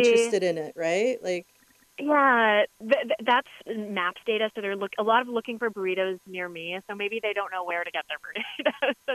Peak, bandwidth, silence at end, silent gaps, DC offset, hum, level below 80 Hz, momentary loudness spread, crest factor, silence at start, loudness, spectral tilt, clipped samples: -8 dBFS; 13.5 kHz; 0 s; none; under 0.1%; none; -78 dBFS; 13 LU; 18 dB; 0 s; -26 LUFS; -3.5 dB/octave; under 0.1%